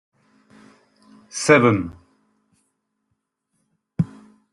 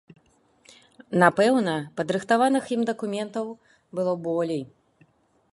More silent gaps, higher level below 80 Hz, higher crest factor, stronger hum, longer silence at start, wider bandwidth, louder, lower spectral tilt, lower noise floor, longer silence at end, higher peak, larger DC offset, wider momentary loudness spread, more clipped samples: neither; first, -60 dBFS vs -72 dBFS; about the same, 22 dB vs 24 dB; neither; first, 1.35 s vs 1.1 s; about the same, 12 kHz vs 11.5 kHz; first, -19 LUFS vs -24 LUFS; about the same, -5.5 dB/octave vs -5.5 dB/octave; first, -76 dBFS vs -62 dBFS; second, 0.45 s vs 0.9 s; about the same, -2 dBFS vs -2 dBFS; neither; first, 20 LU vs 13 LU; neither